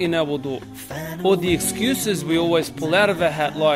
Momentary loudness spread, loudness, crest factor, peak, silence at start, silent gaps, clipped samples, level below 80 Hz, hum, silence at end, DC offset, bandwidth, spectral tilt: 12 LU; -21 LUFS; 16 dB; -4 dBFS; 0 s; none; under 0.1%; -48 dBFS; none; 0 s; under 0.1%; 16 kHz; -4.5 dB/octave